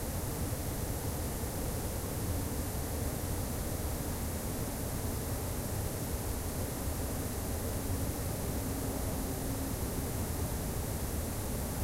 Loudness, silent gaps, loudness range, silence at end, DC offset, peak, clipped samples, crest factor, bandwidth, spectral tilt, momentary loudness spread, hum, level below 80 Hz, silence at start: -36 LUFS; none; 1 LU; 0 s; under 0.1%; -22 dBFS; under 0.1%; 14 dB; 16 kHz; -5 dB/octave; 1 LU; none; -40 dBFS; 0 s